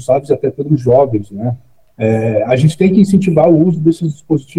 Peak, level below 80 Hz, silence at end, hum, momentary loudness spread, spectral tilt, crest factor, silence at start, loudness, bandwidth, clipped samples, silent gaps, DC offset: 0 dBFS; -48 dBFS; 0 s; none; 10 LU; -8.5 dB/octave; 12 dB; 0 s; -13 LUFS; 12 kHz; under 0.1%; none; under 0.1%